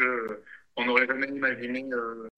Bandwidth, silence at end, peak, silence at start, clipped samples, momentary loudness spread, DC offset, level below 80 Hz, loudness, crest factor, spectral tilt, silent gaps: 8.4 kHz; 0.1 s; -8 dBFS; 0 s; under 0.1%; 14 LU; under 0.1%; -74 dBFS; -27 LUFS; 22 dB; -5.5 dB/octave; none